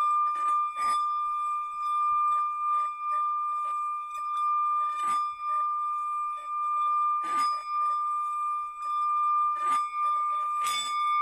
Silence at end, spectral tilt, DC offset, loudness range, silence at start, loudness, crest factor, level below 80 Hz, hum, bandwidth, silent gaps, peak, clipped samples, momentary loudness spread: 0 s; 1 dB/octave; under 0.1%; 1 LU; 0 s; -28 LUFS; 12 dB; -72 dBFS; none; 12.5 kHz; none; -16 dBFS; under 0.1%; 5 LU